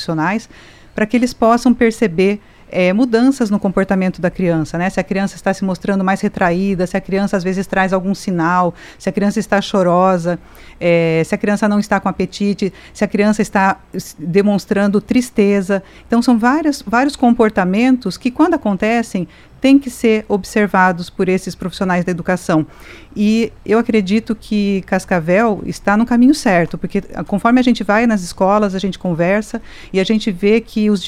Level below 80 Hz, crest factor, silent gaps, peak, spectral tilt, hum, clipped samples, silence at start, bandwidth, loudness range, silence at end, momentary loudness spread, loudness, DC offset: -42 dBFS; 14 dB; none; 0 dBFS; -6 dB/octave; none; under 0.1%; 0 s; 14.5 kHz; 3 LU; 0 s; 8 LU; -15 LUFS; under 0.1%